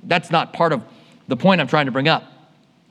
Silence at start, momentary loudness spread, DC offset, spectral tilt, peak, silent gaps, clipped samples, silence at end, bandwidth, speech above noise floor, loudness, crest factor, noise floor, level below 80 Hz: 0.05 s; 6 LU; under 0.1%; -6.5 dB/octave; 0 dBFS; none; under 0.1%; 0.65 s; 11 kHz; 36 dB; -19 LUFS; 20 dB; -54 dBFS; -74 dBFS